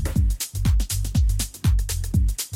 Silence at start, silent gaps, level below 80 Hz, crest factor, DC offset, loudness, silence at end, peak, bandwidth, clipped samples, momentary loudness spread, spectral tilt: 0 s; none; -24 dBFS; 10 dB; under 0.1%; -24 LUFS; 0 s; -10 dBFS; 17 kHz; under 0.1%; 2 LU; -4.5 dB/octave